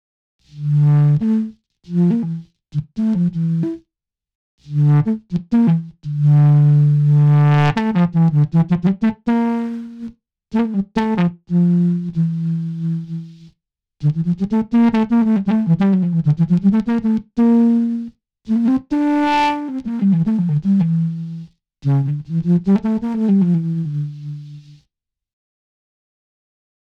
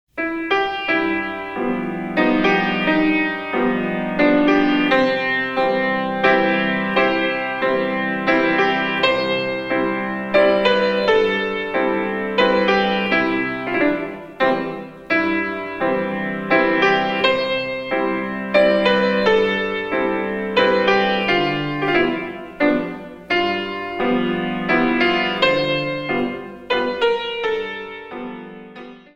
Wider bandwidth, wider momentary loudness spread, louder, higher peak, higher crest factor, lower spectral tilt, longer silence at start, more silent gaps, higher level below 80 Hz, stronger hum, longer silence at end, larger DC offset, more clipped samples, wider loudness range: second, 6 kHz vs 8.2 kHz; first, 13 LU vs 8 LU; about the same, -17 LUFS vs -19 LUFS; about the same, -4 dBFS vs -2 dBFS; about the same, 14 dB vs 18 dB; first, -9.5 dB/octave vs -6 dB/octave; first, 0.55 s vs 0.15 s; first, 4.35-4.58 s vs none; about the same, -50 dBFS vs -50 dBFS; neither; first, 2.3 s vs 0.15 s; neither; neither; first, 6 LU vs 3 LU